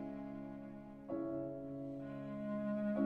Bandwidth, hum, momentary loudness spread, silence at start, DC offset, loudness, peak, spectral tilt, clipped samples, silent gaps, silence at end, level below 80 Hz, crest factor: 4.6 kHz; none; 10 LU; 0 s; under 0.1%; -44 LUFS; -24 dBFS; -10 dB/octave; under 0.1%; none; 0 s; -68 dBFS; 18 dB